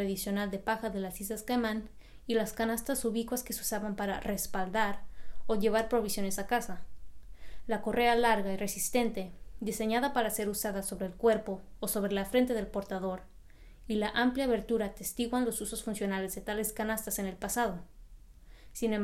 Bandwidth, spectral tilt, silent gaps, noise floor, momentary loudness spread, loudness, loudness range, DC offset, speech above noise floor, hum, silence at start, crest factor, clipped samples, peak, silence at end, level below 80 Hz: 16 kHz; -4 dB/octave; none; -53 dBFS; 9 LU; -32 LUFS; 3 LU; under 0.1%; 21 dB; none; 0 s; 18 dB; under 0.1%; -14 dBFS; 0 s; -52 dBFS